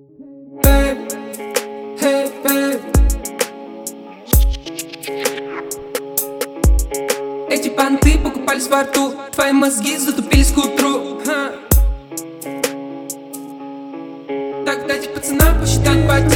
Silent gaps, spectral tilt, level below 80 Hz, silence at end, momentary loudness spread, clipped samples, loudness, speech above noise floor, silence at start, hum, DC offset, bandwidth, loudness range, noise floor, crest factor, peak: none; -4.5 dB/octave; -22 dBFS; 0 s; 15 LU; under 0.1%; -17 LUFS; 24 dB; 0.2 s; none; under 0.1%; over 20 kHz; 6 LU; -39 dBFS; 16 dB; 0 dBFS